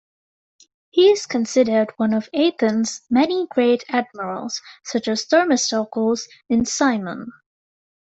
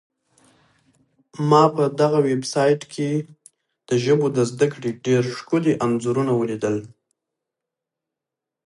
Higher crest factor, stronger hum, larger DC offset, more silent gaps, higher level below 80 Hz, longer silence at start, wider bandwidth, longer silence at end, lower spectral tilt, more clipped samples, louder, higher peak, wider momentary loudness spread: about the same, 18 dB vs 20 dB; neither; neither; neither; first, -58 dBFS vs -66 dBFS; second, 0.95 s vs 1.35 s; second, 8.2 kHz vs 11.5 kHz; second, 0.75 s vs 1.8 s; second, -3.5 dB/octave vs -6.5 dB/octave; neither; about the same, -20 LUFS vs -21 LUFS; about the same, -4 dBFS vs -2 dBFS; first, 12 LU vs 8 LU